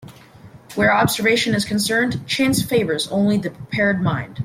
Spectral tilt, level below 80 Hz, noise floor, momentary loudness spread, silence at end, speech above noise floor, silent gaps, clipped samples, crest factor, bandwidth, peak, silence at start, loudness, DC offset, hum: -4.5 dB/octave; -50 dBFS; -44 dBFS; 6 LU; 0 s; 25 dB; none; under 0.1%; 16 dB; 16.5 kHz; -4 dBFS; 0 s; -19 LUFS; under 0.1%; none